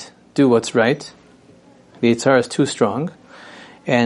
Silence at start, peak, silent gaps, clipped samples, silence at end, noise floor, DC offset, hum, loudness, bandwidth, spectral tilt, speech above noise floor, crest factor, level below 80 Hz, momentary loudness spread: 0 s; -2 dBFS; none; under 0.1%; 0 s; -48 dBFS; under 0.1%; none; -18 LUFS; 11.5 kHz; -5.5 dB/octave; 32 dB; 18 dB; -64 dBFS; 18 LU